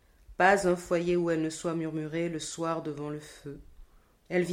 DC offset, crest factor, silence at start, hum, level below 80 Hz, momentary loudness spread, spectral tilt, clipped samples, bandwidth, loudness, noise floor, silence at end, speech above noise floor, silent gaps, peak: under 0.1%; 22 dB; 0.3 s; none; -58 dBFS; 21 LU; -5.5 dB/octave; under 0.1%; 15 kHz; -29 LUFS; -56 dBFS; 0 s; 26 dB; none; -8 dBFS